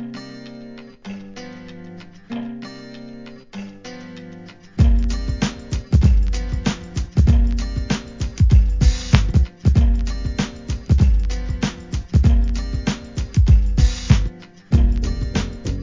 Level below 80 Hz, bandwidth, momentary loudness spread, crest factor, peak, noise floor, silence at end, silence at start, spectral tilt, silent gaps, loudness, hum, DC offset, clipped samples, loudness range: -20 dBFS; 7.6 kHz; 21 LU; 18 dB; 0 dBFS; -39 dBFS; 0 s; 0 s; -6.5 dB/octave; none; -20 LUFS; none; 0.2%; under 0.1%; 16 LU